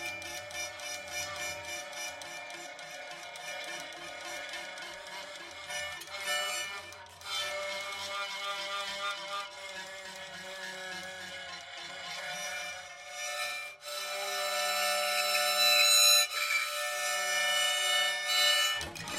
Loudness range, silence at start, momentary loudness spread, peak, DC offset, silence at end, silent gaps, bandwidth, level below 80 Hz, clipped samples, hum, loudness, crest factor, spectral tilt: 15 LU; 0 s; 17 LU; -10 dBFS; under 0.1%; 0 s; none; 16.5 kHz; -72 dBFS; under 0.1%; none; -30 LUFS; 22 dB; 1.5 dB/octave